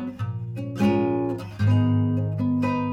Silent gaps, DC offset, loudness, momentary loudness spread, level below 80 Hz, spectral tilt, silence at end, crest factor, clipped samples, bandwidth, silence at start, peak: none; under 0.1%; -24 LUFS; 10 LU; -54 dBFS; -9 dB/octave; 0 s; 12 dB; under 0.1%; 7.4 kHz; 0 s; -10 dBFS